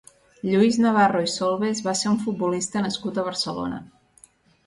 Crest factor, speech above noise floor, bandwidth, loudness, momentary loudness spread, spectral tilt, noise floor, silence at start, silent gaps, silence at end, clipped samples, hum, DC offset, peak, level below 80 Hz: 18 dB; 33 dB; 11.5 kHz; -23 LUFS; 10 LU; -4.5 dB/octave; -56 dBFS; 0.45 s; none; 0.8 s; under 0.1%; none; under 0.1%; -6 dBFS; -60 dBFS